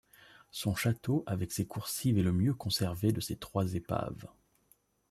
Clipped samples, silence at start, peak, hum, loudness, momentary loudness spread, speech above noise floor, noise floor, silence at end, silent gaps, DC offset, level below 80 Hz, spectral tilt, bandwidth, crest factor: under 0.1%; 0.55 s; -16 dBFS; none; -33 LUFS; 8 LU; 38 dB; -70 dBFS; 0.85 s; none; under 0.1%; -60 dBFS; -5.5 dB/octave; 15 kHz; 18 dB